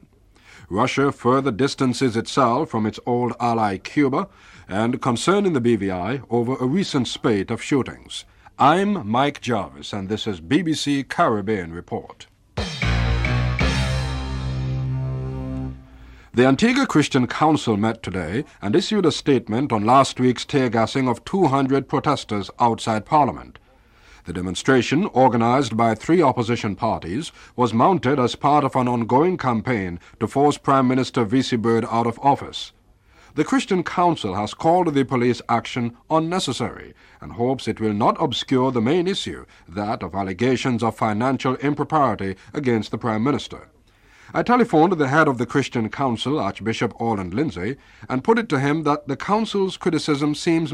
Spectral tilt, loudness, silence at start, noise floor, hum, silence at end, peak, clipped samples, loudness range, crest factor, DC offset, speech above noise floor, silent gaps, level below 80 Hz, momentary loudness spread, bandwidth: -6 dB/octave; -21 LUFS; 0.7 s; -53 dBFS; none; 0 s; -4 dBFS; under 0.1%; 3 LU; 16 dB; under 0.1%; 33 dB; none; -40 dBFS; 11 LU; 12 kHz